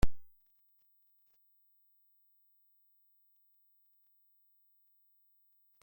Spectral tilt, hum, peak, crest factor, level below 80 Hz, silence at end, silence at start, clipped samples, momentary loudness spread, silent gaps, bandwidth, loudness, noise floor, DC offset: -6 dB/octave; 50 Hz at -115 dBFS; -14 dBFS; 24 dB; -48 dBFS; 5.6 s; 0.05 s; under 0.1%; 0 LU; none; 16.5 kHz; -58 LUFS; -71 dBFS; under 0.1%